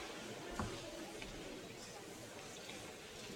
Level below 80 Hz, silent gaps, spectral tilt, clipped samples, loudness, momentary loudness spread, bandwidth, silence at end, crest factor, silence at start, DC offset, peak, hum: -64 dBFS; none; -3.5 dB/octave; under 0.1%; -49 LUFS; 6 LU; 17.5 kHz; 0 s; 22 dB; 0 s; under 0.1%; -28 dBFS; none